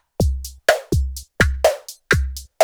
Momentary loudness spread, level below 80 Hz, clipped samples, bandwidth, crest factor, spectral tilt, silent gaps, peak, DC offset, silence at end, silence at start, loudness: 11 LU; -26 dBFS; under 0.1%; over 20 kHz; 20 dB; -4.5 dB/octave; none; 0 dBFS; under 0.1%; 0 s; 0.2 s; -20 LUFS